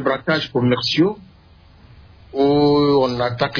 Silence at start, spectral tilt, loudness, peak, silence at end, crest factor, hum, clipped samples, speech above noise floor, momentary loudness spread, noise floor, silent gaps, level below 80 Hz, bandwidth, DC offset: 0 s; -6.5 dB/octave; -17 LUFS; -4 dBFS; 0 s; 14 dB; none; under 0.1%; 31 dB; 6 LU; -48 dBFS; none; -48 dBFS; 5.4 kHz; under 0.1%